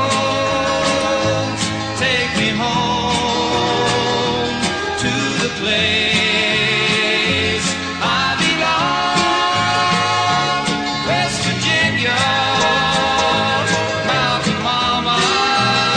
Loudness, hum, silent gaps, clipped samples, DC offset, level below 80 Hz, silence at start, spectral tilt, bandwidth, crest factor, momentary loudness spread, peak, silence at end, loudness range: -16 LUFS; none; none; under 0.1%; under 0.1%; -42 dBFS; 0 s; -3.5 dB/octave; 10.5 kHz; 14 dB; 4 LU; -4 dBFS; 0 s; 2 LU